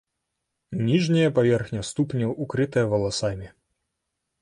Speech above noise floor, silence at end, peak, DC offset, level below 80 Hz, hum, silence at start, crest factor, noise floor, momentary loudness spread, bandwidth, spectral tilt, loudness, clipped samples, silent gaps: 57 dB; 0.95 s; -8 dBFS; under 0.1%; -52 dBFS; none; 0.7 s; 16 dB; -80 dBFS; 10 LU; 11 kHz; -6 dB/octave; -24 LUFS; under 0.1%; none